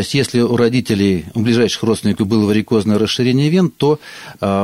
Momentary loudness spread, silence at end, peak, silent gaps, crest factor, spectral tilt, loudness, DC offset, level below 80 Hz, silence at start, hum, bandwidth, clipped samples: 4 LU; 0 s; -2 dBFS; none; 12 dB; -6 dB/octave; -15 LUFS; 0.1%; -48 dBFS; 0 s; none; 15.5 kHz; under 0.1%